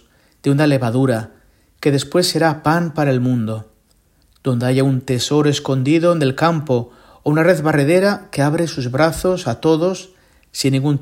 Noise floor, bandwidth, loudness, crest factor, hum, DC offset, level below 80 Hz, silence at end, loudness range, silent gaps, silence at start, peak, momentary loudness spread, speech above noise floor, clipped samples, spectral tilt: -57 dBFS; 16.5 kHz; -17 LUFS; 16 dB; none; under 0.1%; -48 dBFS; 0 s; 2 LU; none; 0.45 s; 0 dBFS; 8 LU; 41 dB; under 0.1%; -6 dB/octave